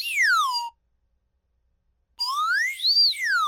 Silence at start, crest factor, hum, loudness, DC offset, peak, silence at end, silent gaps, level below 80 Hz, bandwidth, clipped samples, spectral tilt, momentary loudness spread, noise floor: 0 s; 12 dB; none; -21 LUFS; under 0.1%; -12 dBFS; 0 s; none; -72 dBFS; over 20 kHz; under 0.1%; 6.5 dB/octave; 12 LU; -71 dBFS